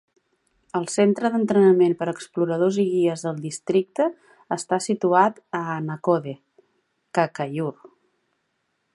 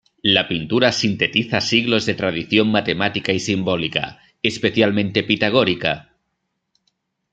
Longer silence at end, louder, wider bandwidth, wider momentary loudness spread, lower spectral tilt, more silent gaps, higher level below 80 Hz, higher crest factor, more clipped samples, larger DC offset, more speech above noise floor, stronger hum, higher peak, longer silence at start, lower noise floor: second, 1.05 s vs 1.3 s; second, -22 LUFS vs -18 LUFS; first, 11.5 kHz vs 9 kHz; first, 12 LU vs 6 LU; first, -6 dB/octave vs -4.5 dB/octave; neither; second, -74 dBFS vs -54 dBFS; about the same, 20 dB vs 18 dB; neither; neither; second, 52 dB vs 56 dB; neither; about the same, -2 dBFS vs -2 dBFS; first, 0.75 s vs 0.25 s; about the same, -73 dBFS vs -74 dBFS